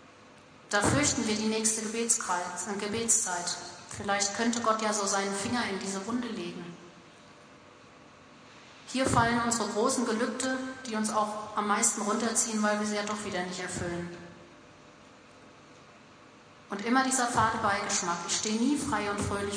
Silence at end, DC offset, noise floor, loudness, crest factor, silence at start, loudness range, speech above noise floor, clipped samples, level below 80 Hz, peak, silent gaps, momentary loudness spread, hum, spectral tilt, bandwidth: 0 s; under 0.1%; -54 dBFS; -29 LUFS; 20 dB; 0 s; 9 LU; 24 dB; under 0.1%; -58 dBFS; -10 dBFS; none; 11 LU; none; -3 dB/octave; 11 kHz